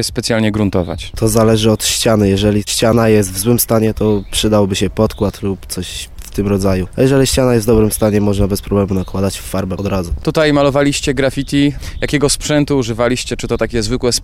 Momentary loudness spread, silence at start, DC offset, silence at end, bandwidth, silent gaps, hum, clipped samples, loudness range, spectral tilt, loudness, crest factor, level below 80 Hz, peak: 8 LU; 0 s; under 0.1%; 0 s; 16.5 kHz; none; none; under 0.1%; 3 LU; -5 dB/octave; -14 LUFS; 14 dB; -28 dBFS; 0 dBFS